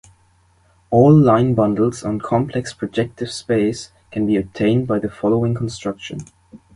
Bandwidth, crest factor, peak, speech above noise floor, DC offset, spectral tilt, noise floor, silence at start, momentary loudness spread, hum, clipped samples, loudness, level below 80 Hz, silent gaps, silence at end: 11.5 kHz; 18 dB; 0 dBFS; 39 dB; under 0.1%; -7.5 dB/octave; -56 dBFS; 0.9 s; 15 LU; none; under 0.1%; -18 LUFS; -48 dBFS; none; 0.2 s